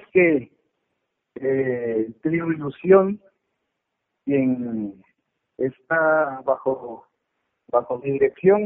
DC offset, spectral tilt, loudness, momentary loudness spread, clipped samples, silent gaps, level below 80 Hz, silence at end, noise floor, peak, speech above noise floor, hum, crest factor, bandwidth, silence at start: under 0.1%; -7.5 dB/octave; -22 LUFS; 14 LU; under 0.1%; none; -64 dBFS; 0 s; -79 dBFS; -2 dBFS; 58 dB; none; 20 dB; 3.7 kHz; 0.15 s